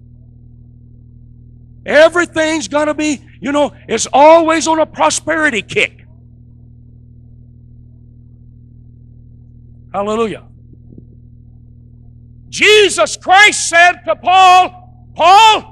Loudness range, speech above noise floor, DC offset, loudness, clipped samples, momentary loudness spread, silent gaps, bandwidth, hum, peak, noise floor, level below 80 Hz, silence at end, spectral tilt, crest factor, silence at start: 15 LU; 29 dB; under 0.1%; -10 LUFS; under 0.1%; 12 LU; none; 14 kHz; none; 0 dBFS; -40 dBFS; -44 dBFS; 0.1 s; -2 dB/octave; 14 dB; 1.85 s